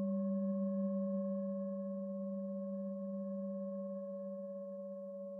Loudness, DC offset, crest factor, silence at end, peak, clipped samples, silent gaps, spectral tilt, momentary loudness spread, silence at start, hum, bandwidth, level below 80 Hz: -41 LUFS; under 0.1%; 10 dB; 0 s; -30 dBFS; under 0.1%; none; -14 dB/octave; 9 LU; 0 s; none; 1.8 kHz; under -90 dBFS